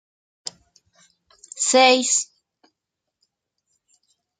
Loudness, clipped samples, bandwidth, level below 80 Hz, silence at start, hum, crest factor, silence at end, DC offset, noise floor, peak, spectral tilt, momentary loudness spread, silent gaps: -17 LUFS; under 0.1%; 9.6 kHz; -78 dBFS; 0.45 s; none; 24 dB; 2.15 s; under 0.1%; -82 dBFS; -2 dBFS; 0.5 dB/octave; 22 LU; none